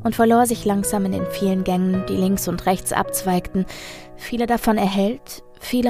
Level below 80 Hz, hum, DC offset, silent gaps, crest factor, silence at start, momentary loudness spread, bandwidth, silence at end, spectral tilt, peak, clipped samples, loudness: -42 dBFS; none; under 0.1%; none; 18 dB; 0 s; 14 LU; 15.5 kHz; 0 s; -5.5 dB/octave; -2 dBFS; under 0.1%; -20 LUFS